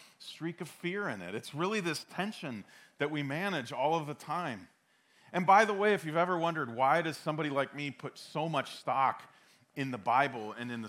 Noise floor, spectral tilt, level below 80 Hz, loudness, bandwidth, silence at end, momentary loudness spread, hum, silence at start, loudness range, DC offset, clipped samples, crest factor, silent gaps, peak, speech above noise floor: -68 dBFS; -5 dB/octave; -86 dBFS; -33 LUFS; 16.5 kHz; 0 s; 12 LU; none; 0 s; 6 LU; under 0.1%; under 0.1%; 22 dB; none; -12 dBFS; 35 dB